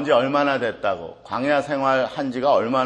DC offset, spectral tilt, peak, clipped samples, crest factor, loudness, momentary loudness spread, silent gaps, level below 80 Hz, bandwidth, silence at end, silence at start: under 0.1%; -6 dB/octave; -6 dBFS; under 0.1%; 16 dB; -21 LUFS; 7 LU; none; -60 dBFS; 9.4 kHz; 0 s; 0 s